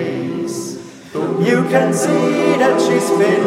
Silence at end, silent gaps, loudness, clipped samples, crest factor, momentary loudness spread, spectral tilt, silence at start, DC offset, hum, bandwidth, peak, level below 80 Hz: 0 s; none; -16 LUFS; under 0.1%; 14 dB; 12 LU; -5.5 dB/octave; 0 s; under 0.1%; none; 16 kHz; -2 dBFS; -66 dBFS